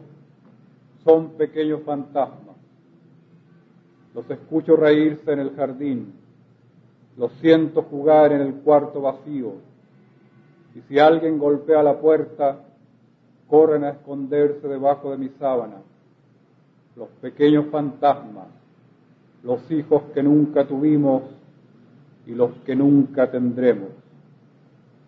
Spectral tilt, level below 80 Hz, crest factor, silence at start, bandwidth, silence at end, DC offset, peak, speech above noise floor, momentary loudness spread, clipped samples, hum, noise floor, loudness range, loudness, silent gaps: -9.5 dB/octave; -72 dBFS; 20 dB; 1.05 s; 4.9 kHz; 1.15 s; under 0.1%; -2 dBFS; 37 dB; 16 LU; under 0.1%; none; -57 dBFS; 5 LU; -20 LUFS; none